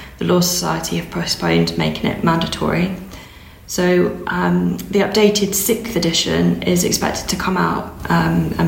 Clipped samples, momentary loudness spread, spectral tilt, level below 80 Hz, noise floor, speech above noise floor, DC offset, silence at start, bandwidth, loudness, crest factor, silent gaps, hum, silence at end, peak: under 0.1%; 6 LU; -4.5 dB/octave; -38 dBFS; -39 dBFS; 22 dB; under 0.1%; 0 s; 16.5 kHz; -17 LUFS; 18 dB; none; none; 0 s; 0 dBFS